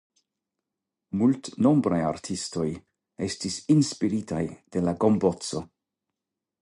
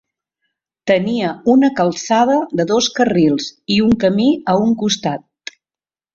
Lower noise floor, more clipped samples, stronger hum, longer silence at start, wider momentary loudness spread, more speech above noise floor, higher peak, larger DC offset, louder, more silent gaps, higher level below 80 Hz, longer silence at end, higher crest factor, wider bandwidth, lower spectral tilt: about the same, -87 dBFS vs under -90 dBFS; neither; neither; first, 1.15 s vs 0.85 s; about the same, 11 LU vs 10 LU; second, 62 dB vs over 75 dB; second, -8 dBFS vs -2 dBFS; neither; second, -26 LUFS vs -15 LUFS; neither; about the same, -56 dBFS vs -52 dBFS; about the same, 1 s vs 0.95 s; about the same, 18 dB vs 14 dB; first, 11.5 kHz vs 7.6 kHz; about the same, -6 dB/octave vs -5 dB/octave